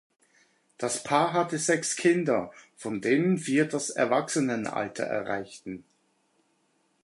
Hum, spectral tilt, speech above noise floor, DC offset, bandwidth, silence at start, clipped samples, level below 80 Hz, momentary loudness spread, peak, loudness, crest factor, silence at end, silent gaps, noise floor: none; -4.5 dB/octave; 44 dB; under 0.1%; 11.5 kHz; 0.8 s; under 0.1%; -72 dBFS; 15 LU; -8 dBFS; -27 LUFS; 20 dB; 1.25 s; none; -71 dBFS